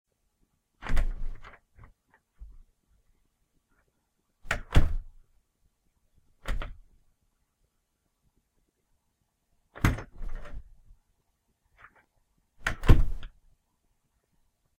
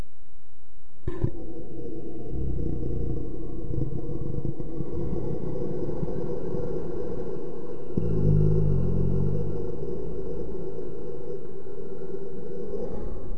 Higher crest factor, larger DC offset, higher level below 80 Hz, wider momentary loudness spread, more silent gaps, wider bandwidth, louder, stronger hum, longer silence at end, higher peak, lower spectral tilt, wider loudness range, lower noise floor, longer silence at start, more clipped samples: first, 26 dB vs 20 dB; second, under 0.1% vs 9%; first, -32 dBFS vs -38 dBFS; first, 24 LU vs 12 LU; neither; first, 12 kHz vs 6.2 kHz; about the same, -31 LUFS vs -32 LUFS; neither; first, 1.55 s vs 0 s; first, -4 dBFS vs -10 dBFS; second, -6 dB/octave vs -11.5 dB/octave; first, 14 LU vs 8 LU; first, -77 dBFS vs -51 dBFS; first, 0.85 s vs 0 s; neither